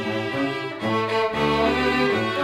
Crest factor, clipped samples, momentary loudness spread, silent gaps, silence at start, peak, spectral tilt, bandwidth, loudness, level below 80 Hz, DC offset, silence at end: 16 dB; under 0.1%; 5 LU; none; 0 s; -8 dBFS; -5.5 dB/octave; 17.5 kHz; -22 LUFS; -46 dBFS; under 0.1%; 0 s